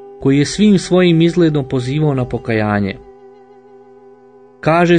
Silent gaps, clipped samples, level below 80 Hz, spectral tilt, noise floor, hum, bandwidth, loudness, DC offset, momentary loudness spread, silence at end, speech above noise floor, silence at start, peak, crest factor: none; under 0.1%; -42 dBFS; -6.5 dB/octave; -44 dBFS; none; 9.6 kHz; -14 LUFS; under 0.1%; 8 LU; 0 s; 31 dB; 0 s; -2 dBFS; 14 dB